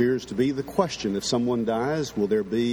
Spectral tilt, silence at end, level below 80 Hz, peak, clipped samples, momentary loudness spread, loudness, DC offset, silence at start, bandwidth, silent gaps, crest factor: -5.5 dB/octave; 0 s; -54 dBFS; -6 dBFS; under 0.1%; 2 LU; -25 LUFS; under 0.1%; 0 s; 19 kHz; none; 18 dB